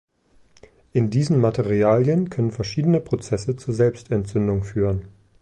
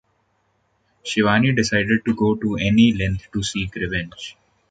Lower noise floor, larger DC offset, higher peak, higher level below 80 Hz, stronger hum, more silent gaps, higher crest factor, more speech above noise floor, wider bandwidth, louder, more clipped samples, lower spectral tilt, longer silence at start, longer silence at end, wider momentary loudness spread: second, -56 dBFS vs -66 dBFS; neither; second, -6 dBFS vs -2 dBFS; about the same, -44 dBFS vs -42 dBFS; neither; neither; about the same, 16 dB vs 18 dB; second, 36 dB vs 47 dB; about the same, 9.6 kHz vs 9.2 kHz; about the same, -22 LUFS vs -20 LUFS; neither; first, -8 dB/octave vs -5.5 dB/octave; about the same, 0.95 s vs 1.05 s; about the same, 0.35 s vs 0.4 s; second, 7 LU vs 14 LU